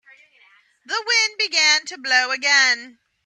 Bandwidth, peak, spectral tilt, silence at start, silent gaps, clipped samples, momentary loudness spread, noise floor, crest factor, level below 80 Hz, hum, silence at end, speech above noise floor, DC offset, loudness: 12 kHz; -4 dBFS; 3.5 dB/octave; 0.9 s; none; under 0.1%; 9 LU; -56 dBFS; 18 dB; -82 dBFS; none; 0.35 s; 37 dB; under 0.1%; -17 LUFS